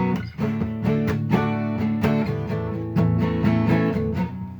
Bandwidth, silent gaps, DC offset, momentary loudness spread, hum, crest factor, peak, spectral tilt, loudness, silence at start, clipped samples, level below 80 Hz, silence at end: over 20 kHz; none; under 0.1%; 6 LU; none; 16 dB; -6 dBFS; -9 dB/octave; -23 LUFS; 0 s; under 0.1%; -42 dBFS; 0 s